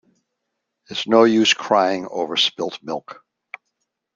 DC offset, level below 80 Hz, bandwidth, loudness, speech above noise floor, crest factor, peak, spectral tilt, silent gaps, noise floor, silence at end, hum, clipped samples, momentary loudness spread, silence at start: under 0.1%; -68 dBFS; 7.6 kHz; -18 LUFS; 59 dB; 20 dB; -2 dBFS; -3.5 dB/octave; none; -78 dBFS; 1 s; none; under 0.1%; 25 LU; 0.9 s